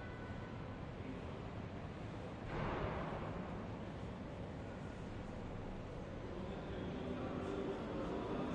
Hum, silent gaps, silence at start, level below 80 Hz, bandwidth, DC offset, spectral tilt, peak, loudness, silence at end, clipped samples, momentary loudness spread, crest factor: none; none; 0 s; -56 dBFS; 10.5 kHz; under 0.1%; -7.5 dB/octave; -28 dBFS; -46 LUFS; 0 s; under 0.1%; 6 LU; 16 dB